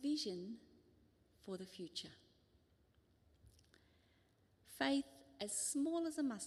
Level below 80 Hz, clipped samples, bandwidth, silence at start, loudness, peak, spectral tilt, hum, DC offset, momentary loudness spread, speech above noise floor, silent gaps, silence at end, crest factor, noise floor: -80 dBFS; under 0.1%; 13.5 kHz; 0 s; -43 LUFS; -24 dBFS; -3 dB/octave; none; under 0.1%; 18 LU; 32 dB; none; 0 s; 22 dB; -75 dBFS